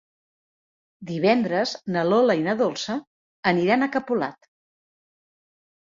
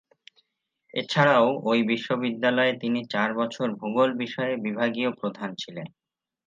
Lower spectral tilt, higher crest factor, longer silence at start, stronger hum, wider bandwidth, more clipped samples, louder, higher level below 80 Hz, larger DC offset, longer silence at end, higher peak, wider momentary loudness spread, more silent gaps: about the same, -5.5 dB/octave vs -6 dB/octave; about the same, 20 dB vs 20 dB; about the same, 1 s vs 0.95 s; neither; about the same, 7.6 kHz vs 7.6 kHz; neither; about the same, -23 LUFS vs -25 LUFS; first, -68 dBFS vs -76 dBFS; neither; first, 1.55 s vs 0.6 s; about the same, -4 dBFS vs -6 dBFS; about the same, 12 LU vs 13 LU; first, 3.07-3.43 s vs none